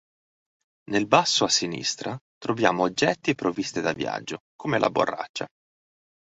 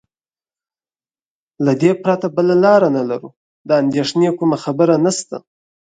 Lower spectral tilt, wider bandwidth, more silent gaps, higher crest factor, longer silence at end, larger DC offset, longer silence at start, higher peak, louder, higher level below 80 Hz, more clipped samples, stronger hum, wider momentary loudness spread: second, -3.5 dB/octave vs -6 dB/octave; second, 8.4 kHz vs 9.4 kHz; first, 2.21-2.41 s, 4.40-4.59 s, 5.29-5.34 s vs 3.37-3.65 s; first, 24 dB vs 16 dB; first, 0.75 s vs 0.55 s; neither; second, 0.9 s vs 1.6 s; about the same, -2 dBFS vs 0 dBFS; second, -24 LUFS vs -15 LUFS; about the same, -64 dBFS vs -62 dBFS; neither; neither; about the same, 13 LU vs 12 LU